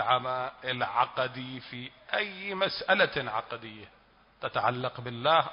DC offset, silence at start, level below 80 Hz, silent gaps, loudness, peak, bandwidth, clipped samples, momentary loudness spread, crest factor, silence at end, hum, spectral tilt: under 0.1%; 0 s; -66 dBFS; none; -30 LUFS; -10 dBFS; 5.4 kHz; under 0.1%; 16 LU; 20 dB; 0 s; none; -8 dB/octave